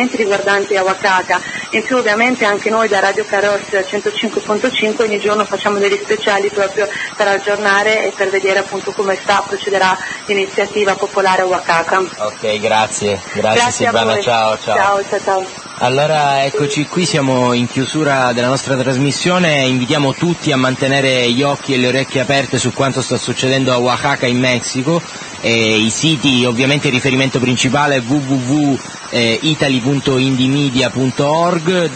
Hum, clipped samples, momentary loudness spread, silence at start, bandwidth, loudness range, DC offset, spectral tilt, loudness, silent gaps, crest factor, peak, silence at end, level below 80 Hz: none; under 0.1%; 5 LU; 0 s; 8.8 kHz; 2 LU; under 0.1%; -4 dB/octave; -14 LUFS; none; 14 dB; 0 dBFS; 0 s; -52 dBFS